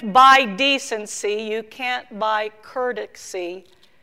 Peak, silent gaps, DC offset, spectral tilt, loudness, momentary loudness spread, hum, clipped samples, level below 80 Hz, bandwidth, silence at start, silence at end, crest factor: -4 dBFS; none; 0.2%; -2 dB/octave; -19 LUFS; 19 LU; none; under 0.1%; -64 dBFS; 16 kHz; 0 s; 0.4 s; 18 dB